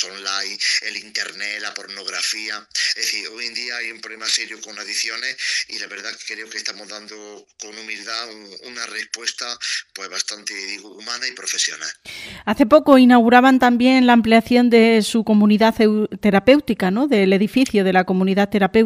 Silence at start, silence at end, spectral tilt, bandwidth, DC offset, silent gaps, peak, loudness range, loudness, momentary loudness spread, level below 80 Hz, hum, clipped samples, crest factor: 0 s; 0 s; -4 dB/octave; 14.5 kHz; under 0.1%; none; 0 dBFS; 14 LU; -18 LUFS; 17 LU; -54 dBFS; none; under 0.1%; 18 dB